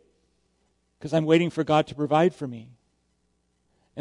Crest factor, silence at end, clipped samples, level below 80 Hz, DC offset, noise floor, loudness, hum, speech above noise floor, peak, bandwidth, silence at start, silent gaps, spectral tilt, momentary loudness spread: 20 dB; 0 s; under 0.1%; -66 dBFS; under 0.1%; -71 dBFS; -23 LUFS; none; 48 dB; -8 dBFS; 11 kHz; 1 s; none; -7 dB/octave; 20 LU